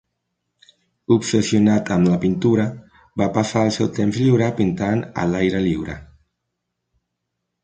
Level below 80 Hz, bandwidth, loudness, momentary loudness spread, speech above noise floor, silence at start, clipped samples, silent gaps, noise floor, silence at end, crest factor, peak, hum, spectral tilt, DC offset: -46 dBFS; 9.4 kHz; -19 LUFS; 9 LU; 60 dB; 1.1 s; under 0.1%; none; -78 dBFS; 1.6 s; 18 dB; -2 dBFS; none; -6.5 dB/octave; under 0.1%